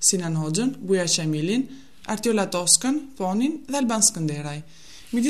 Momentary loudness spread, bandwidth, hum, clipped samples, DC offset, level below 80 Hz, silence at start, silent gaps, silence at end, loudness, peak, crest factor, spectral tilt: 14 LU; 14 kHz; none; under 0.1%; 0.6%; -60 dBFS; 0 s; none; 0 s; -22 LUFS; 0 dBFS; 22 dB; -3.5 dB/octave